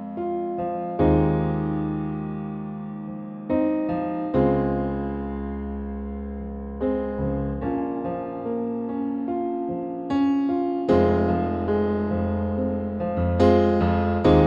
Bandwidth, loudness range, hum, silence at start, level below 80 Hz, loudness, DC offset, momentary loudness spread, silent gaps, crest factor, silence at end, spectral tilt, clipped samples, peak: 7.4 kHz; 6 LU; none; 0 s; -38 dBFS; -25 LUFS; under 0.1%; 12 LU; none; 20 dB; 0 s; -9.5 dB/octave; under 0.1%; -4 dBFS